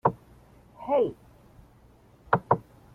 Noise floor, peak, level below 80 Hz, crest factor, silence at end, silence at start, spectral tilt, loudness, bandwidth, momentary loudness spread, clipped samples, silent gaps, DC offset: -57 dBFS; -6 dBFS; -58 dBFS; 24 dB; 0.35 s; 0.05 s; -9 dB/octave; -28 LUFS; 13.5 kHz; 13 LU; under 0.1%; none; under 0.1%